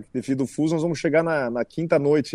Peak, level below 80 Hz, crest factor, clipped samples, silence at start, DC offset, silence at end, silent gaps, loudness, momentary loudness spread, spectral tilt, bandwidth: -6 dBFS; -60 dBFS; 16 dB; under 0.1%; 0 s; under 0.1%; 0 s; none; -23 LUFS; 7 LU; -6.5 dB/octave; 12 kHz